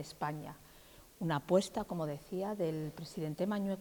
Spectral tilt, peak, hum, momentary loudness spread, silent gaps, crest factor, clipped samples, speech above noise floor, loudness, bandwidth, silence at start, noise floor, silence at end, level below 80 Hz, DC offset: -6.5 dB/octave; -18 dBFS; none; 17 LU; none; 20 dB; under 0.1%; 22 dB; -37 LUFS; 19 kHz; 0 s; -59 dBFS; 0 s; -66 dBFS; under 0.1%